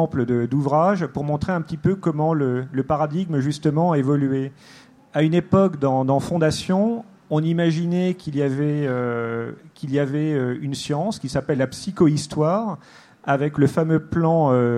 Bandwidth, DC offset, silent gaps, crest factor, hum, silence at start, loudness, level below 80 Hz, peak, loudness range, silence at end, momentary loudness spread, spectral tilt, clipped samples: 12 kHz; under 0.1%; none; 16 dB; none; 0 s; -21 LUFS; -52 dBFS; -4 dBFS; 3 LU; 0 s; 7 LU; -7.5 dB/octave; under 0.1%